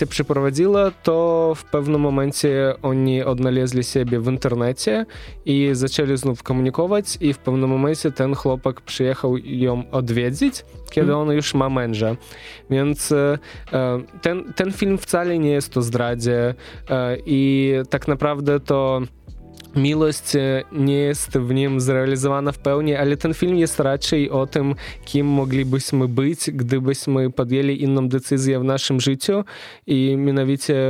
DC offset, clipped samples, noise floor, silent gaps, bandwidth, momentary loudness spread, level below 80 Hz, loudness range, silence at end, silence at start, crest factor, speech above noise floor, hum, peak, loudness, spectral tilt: under 0.1%; under 0.1%; -39 dBFS; none; 16 kHz; 5 LU; -44 dBFS; 2 LU; 0 s; 0 s; 18 dB; 20 dB; none; -2 dBFS; -20 LUFS; -6 dB/octave